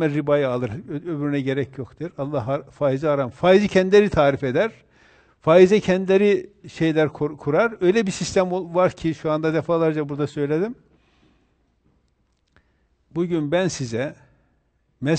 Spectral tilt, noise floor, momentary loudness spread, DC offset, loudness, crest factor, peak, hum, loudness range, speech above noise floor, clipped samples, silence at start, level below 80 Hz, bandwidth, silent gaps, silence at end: -6.5 dB/octave; -66 dBFS; 13 LU; under 0.1%; -21 LUFS; 18 dB; -2 dBFS; none; 10 LU; 46 dB; under 0.1%; 0 s; -52 dBFS; 9 kHz; none; 0 s